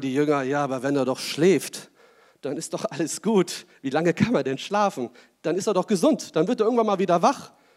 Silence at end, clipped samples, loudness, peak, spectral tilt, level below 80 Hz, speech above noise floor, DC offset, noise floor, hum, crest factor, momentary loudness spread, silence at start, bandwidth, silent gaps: 0.3 s; under 0.1%; -24 LUFS; -6 dBFS; -5 dB/octave; -72 dBFS; 33 dB; under 0.1%; -56 dBFS; none; 18 dB; 12 LU; 0 s; 16 kHz; none